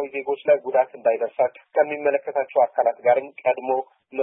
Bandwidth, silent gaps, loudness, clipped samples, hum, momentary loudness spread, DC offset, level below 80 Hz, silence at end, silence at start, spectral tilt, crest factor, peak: 3.7 kHz; none; -22 LUFS; under 0.1%; none; 6 LU; under 0.1%; -80 dBFS; 0 s; 0 s; -9 dB/octave; 16 dB; -6 dBFS